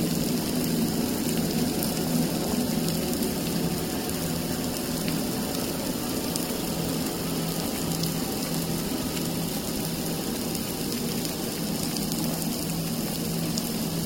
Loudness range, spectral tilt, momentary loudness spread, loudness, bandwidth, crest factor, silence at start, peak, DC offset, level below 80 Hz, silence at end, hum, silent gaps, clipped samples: 2 LU; -4.5 dB/octave; 3 LU; -28 LUFS; 17 kHz; 22 dB; 0 s; -4 dBFS; under 0.1%; -46 dBFS; 0 s; none; none; under 0.1%